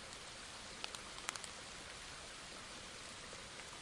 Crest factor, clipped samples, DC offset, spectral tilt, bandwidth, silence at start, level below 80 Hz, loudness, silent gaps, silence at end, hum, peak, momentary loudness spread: 34 dB; under 0.1%; under 0.1%; -1 dB/octave; 12 kHz; 0 s; -66 dBFS; -48 LUFS; none; 0 s; none; -16 dBFS; 5 LU